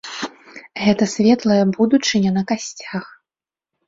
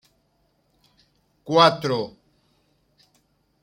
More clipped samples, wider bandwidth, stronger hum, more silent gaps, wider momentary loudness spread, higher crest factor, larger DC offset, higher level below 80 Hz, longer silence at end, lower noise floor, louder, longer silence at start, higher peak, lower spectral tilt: neither; second, 7.8 kHz vs 16.5 kHz; neither; neither; second, 14 LU vs 20 LU; second, 16 dB vs 24 dB; neither; first, -58 dBFS vs -68 dBFS; second, 0.8 s vs 1.55 s; first, under -90 dBFS vs -67 dBFS; about the same, -18 LUFS vs -20 LUFS; second, 0.05 s vs 1.45 s; about the same, -2 dBFS vs -2 dBFS; about the same, -5 dB/octave vs -5 dB/octave